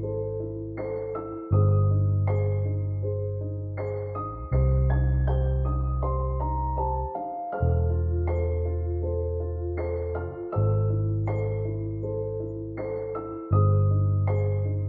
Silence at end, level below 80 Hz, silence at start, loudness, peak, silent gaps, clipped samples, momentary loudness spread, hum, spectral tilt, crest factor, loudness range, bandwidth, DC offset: 0 s; -34 dBFS; 0 s; -27 LUFS; -10 dBFS; none; under 0.1%; 10 LU; none; -13 dB/octave; 14 dB; 2 LU; 2.3 kHz; under 0.1%